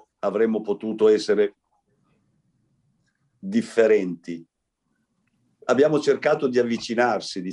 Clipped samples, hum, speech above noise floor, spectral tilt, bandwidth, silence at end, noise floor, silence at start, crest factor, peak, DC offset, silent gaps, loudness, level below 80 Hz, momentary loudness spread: under 0.1%; none; 54 dB; -5.5 dB/octave; 10.5 kHz; 0 s; -75 dBFS; 0.25 s; 18 dB; -6 dBFS; under 0.1%; none; -22 LUFS; -72 dBFS; 13 LU